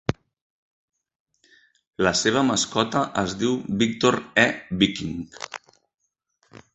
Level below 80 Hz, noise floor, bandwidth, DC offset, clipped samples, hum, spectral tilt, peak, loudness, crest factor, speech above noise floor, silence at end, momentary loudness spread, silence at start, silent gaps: -52 dBFS; -69 dBFS; 8.2 kHz; under 0.1%; under 0.1%; none; -4 dB/octave; -2 dBFS; -22 LUFS; 24 dB; 47 dB; 1.2 s; 15 LU; 0.1 s; 0.41-0.88 s, 1.20-1.26 s, 1.87-1.91 s